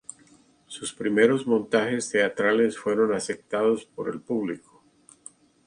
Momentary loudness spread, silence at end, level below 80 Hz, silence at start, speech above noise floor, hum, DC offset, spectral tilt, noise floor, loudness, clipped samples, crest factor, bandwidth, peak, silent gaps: 14 LU; 1.1 s; -68 dBFS; 0.7 s; 33 dB; none; under 0.1%; -4.5 dB/octave; -58 dBFS; -25 LUFS; under 0.1%; 20 dB; 11 kHz; -6 dBFS; none